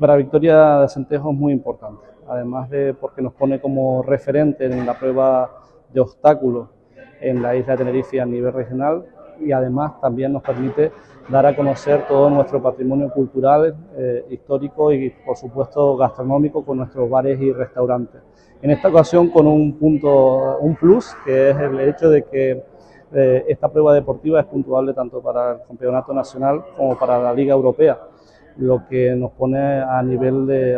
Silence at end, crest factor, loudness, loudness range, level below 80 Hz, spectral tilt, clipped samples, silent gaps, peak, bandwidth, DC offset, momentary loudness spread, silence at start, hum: 0 s; 16 dB; -17 LUFS; 6 LU; -50 dBFS; -9 dB/octave; under 0.1%; none; 0 dBFS; 8 kHz; under 0.1%; 11 LU; 0 s; none